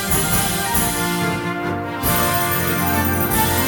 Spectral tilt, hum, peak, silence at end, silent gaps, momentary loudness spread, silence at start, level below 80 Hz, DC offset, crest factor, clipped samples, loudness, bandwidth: -3.5 dB/octave; none; -4 dBFS; 0 s; none; 6 LU; 0 s; -36 dBFS; under 0.1%; 16 dB; under 0.1%; -18 LUFS; 19 kHz